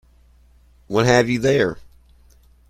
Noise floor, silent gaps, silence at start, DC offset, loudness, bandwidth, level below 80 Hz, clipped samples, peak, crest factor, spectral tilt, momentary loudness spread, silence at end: -52 dBFS; none; 0.9 s; under 0.1%; -18 LUFS; 15.5 kHz; -48 dBFS; under 0.1%; -2 dBFS; 20 dB; -5.5 dB/octave; 8 LU; 0.9 s